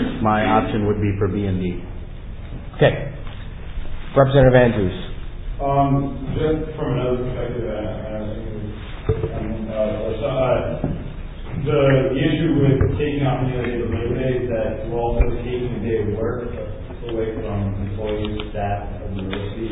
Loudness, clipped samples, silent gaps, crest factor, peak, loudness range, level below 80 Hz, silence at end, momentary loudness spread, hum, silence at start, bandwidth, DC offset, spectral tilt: -21 LUFS; under 0.1%; none; 20 dB; -2 dBFS; 6 LU; -30 dBFS; 0 s; 16 LU; none; 0 s; 4 kHz; under 0.1%; -11.5 dB/octave